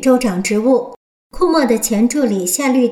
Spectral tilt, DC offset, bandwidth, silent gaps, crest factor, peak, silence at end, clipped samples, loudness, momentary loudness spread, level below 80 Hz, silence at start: -4.5 dB/octave; under 0.1%; 17.5 kHz; 0.96-1.30 s; 12 dB; -4 dBFS; 0 s; under 0.1%; -15 LUFS; 3 LU; -42 dBFS; 0 s